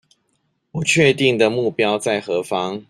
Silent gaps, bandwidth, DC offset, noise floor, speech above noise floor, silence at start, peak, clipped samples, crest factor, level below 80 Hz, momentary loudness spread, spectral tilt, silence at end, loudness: none; 14.5 kHz; under 0.1%; -68 dBFS; 50 dB; 0.75 s; -2 dBFS; under 0.1%; 18 dB; -56 dBFS; 8 LU; -4.5 dB/octave; 0.1 s; -18 LUFS